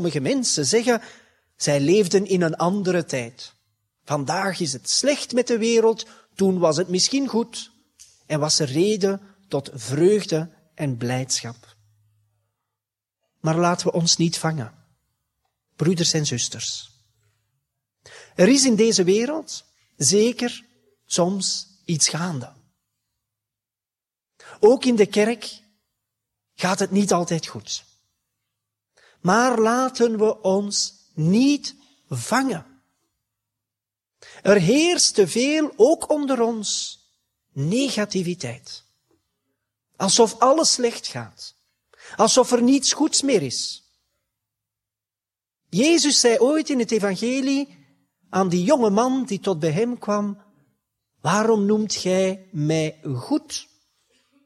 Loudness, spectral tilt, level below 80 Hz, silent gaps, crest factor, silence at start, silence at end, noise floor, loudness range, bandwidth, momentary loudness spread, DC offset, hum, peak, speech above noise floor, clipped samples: -21 LUFS; -4 dB/octave; -66 dBFS; none; 20 dB; 0 s; 0.8 s; under -90 dBFS; 6 LU; 14 kHz; 14 LU; under 0.1%; none; -4 dBFS; over 70 dB; under 0.1%